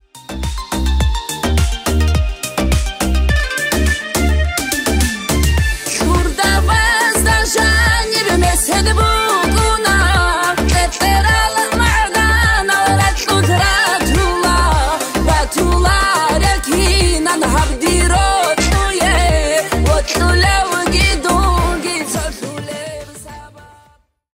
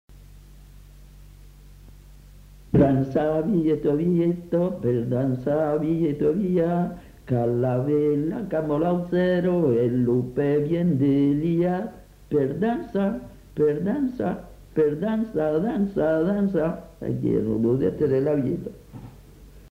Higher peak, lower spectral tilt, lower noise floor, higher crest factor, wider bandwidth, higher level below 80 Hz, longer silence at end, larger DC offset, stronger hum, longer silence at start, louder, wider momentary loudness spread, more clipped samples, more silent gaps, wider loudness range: first, -2 dBFS vs -6 dBFS; second, -4 dB/octave vs -9.5 dB/octave; first, -53 dBFS vs -47 dBFS; about the same, 12 dB vs 16 dB; about the same, 16.5 kHz vs 15 kHz; first, -18 dBFS vs -48 dBFS; first, 0.7 s vs 0.05 s; neither; neither; about the same, 0.15 s vs 0.1 s; first, -14 LUFS vs -23 LUFS; about the same, 6 LU vs 8 LU; neither; neither; about the same, 4 LU vs 3 LU